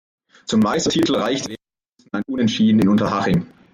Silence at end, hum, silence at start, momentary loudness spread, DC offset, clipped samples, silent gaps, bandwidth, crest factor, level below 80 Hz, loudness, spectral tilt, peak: 0.3 s; none; 0.5 s; 14 LU; under 0.1%; under 0.1%; none; 13 kHz; 12 dB; -50 dBFS; -19 LUFS; -5.5 dB/octave; -6 dBFS